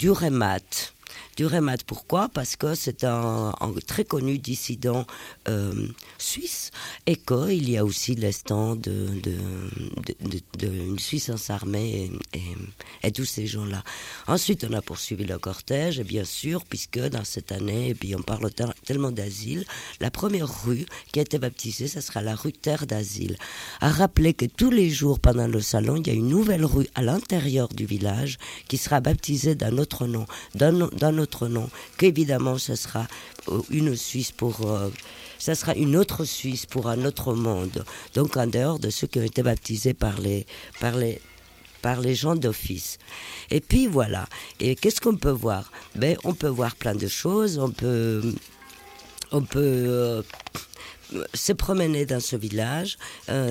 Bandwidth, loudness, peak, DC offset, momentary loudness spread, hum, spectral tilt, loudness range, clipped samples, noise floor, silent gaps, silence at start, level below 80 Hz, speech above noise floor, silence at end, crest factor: 17 kHz; -26 LUFS; -4 dBFS; under 0.1%; 12 LU; none; -5.5 dB/octave; 6 LU; under 0.1%; -50 dBFS; none; 0 s; -40 dBFS; 25 dB; 0 s; 22 dB